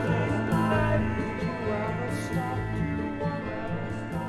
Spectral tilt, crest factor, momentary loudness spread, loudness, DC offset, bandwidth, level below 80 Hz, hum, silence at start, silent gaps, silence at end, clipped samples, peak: -7.5 dB/octave; 16 dB; 8 LU; -29 LUFS; under 0.1%; 13.5 kHz; -42 dBFS; none; 0 s; none; 0 s; under 0.1%; -12 dBFS